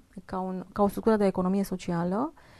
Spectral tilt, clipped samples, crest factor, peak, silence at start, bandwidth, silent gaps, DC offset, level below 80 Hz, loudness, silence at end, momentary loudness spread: -7.5 dB/octave; under 0.1%; 16 dB; -12 dBFS; 0.15 s; 13.5 kHz; none; under 0.1%; -52 dBFS; -28 LUFS; 0.3 s; 10 LU